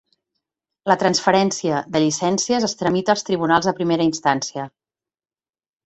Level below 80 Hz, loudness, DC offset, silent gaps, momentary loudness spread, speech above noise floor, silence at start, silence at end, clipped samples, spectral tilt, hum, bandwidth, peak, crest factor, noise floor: -60 dBFS; -19 LUFS; under 0.1%; none; 7 LU; over 71 dB; 0.85 s; 1.15 s; under 0.1%; -4 dB/octave; none; 8.2 kHz; -2 dBFS; 18 dB; under -90 dBFS